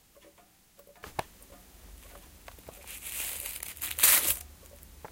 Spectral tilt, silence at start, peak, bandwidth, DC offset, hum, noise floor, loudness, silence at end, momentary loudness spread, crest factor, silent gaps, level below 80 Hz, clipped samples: 0.5 dB/octave; 1.05 s; -6 dBFS; 17 kHz; under 0.1%; none; -61 dBFS; -27 LUFS; 0.05 s; 29 LU; 28 dB; none; -56 dBFS; under 0.1%